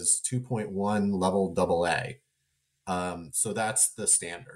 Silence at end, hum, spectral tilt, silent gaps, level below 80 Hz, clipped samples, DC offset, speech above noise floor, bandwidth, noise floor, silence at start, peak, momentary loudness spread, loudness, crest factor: 0 s; none; -3.5 dB/octave; none; -60 dBFS; under 0.1%; under 0.1%; 49 dB; 16 kHz; -77 dBFS; 0 s; -12 dBFS; 9 LU; -27 LUFS; 16 dB